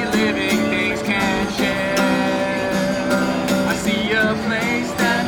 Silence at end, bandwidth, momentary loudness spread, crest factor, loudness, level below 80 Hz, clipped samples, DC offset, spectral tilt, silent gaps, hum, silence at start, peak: 0 s; over 20 kHz; 2 LU; 14 dB; -19 LUFS; -44 dBFS; under 0.1%; under 0.1%; -4.5 dB/octave; none; none; 0 s; -6 dBFS